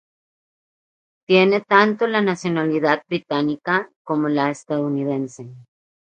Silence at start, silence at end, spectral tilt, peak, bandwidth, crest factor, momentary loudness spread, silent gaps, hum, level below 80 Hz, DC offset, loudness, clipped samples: 1.3 s; 0.55 s; -6 dB/octave; 0 dBFS; 9.4 kHz; 20 dB; 10 LU; 3.96-4.05 s; none; -70 dBFS; under 0.1%; -20 LUFS; under 0.1%